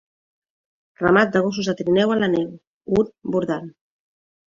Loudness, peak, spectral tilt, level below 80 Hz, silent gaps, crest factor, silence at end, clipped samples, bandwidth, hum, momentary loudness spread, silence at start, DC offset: -20 LUFS; -2 dBFS; -6 dB/octave; -54 dBFS; 2.67-2.81 s; 20 dB; 0.8 s; under 0.1%; 7.4 kHz; none; 12 LU; 1 s; under 0.1%